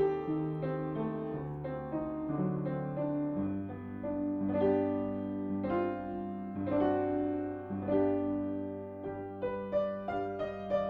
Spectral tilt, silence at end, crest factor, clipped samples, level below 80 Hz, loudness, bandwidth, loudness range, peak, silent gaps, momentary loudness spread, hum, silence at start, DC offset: -10.5 dB/octave; 0 s; 16 dB; under 0.1%; -60 dBFS; -35 LUFS; 4.7 kHz; 3 LU; -18 dBFS; none; 9 LU; none; 0 s; under 0.1%